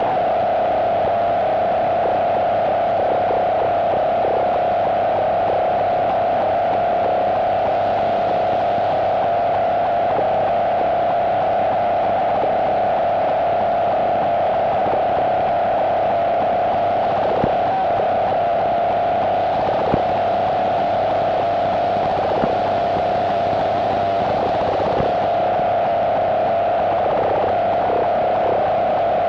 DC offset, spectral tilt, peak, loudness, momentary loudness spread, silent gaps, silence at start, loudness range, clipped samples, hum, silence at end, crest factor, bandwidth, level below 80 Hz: under 0.1%; -7 dB/octave; -2 dBFS; -18 LUFS; 1 LU; none; 0 s; 1 LU; under 0.1%; 50 Hz at -40 dBFS; 0 s; 16 dB; 6.4 kHz; -46 dBFS